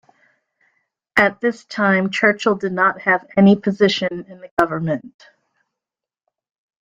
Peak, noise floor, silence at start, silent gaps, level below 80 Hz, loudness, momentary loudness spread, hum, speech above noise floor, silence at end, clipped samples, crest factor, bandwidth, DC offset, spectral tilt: -2 dBFS; -88 dBFS; 1.15 s; 4.51-4.57 s; -58 dBFS; -18 LUFS; 10 LU; none; 70 dB; 1.75 s; under 0.1%; 18 dB; 7.6 kHz; under 0.1%; -6 dB/octave